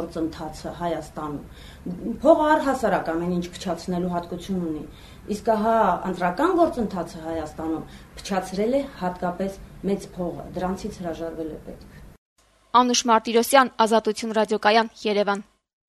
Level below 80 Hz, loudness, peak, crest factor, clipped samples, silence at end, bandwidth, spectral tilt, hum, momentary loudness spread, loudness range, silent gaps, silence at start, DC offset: -48 dBFS; -24 LUFS; -2 dBFS; 22 dB; under 0.1%; 0.45 s; 13.5 kHz; -4.5 dB/octave; none; 15 LU; 8 LU; 12.18-12.36 s; 0 s; under 0.1%